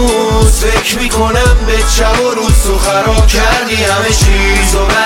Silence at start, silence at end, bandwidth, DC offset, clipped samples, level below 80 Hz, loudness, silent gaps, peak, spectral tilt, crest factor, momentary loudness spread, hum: 0 s; 0 s; 17 kHz; under 0.1%; under 0.1%; -12 dBFS; -10 LUFS; none; 0 dBFS; -4 dB/octave; 8 dB; 2 LU; none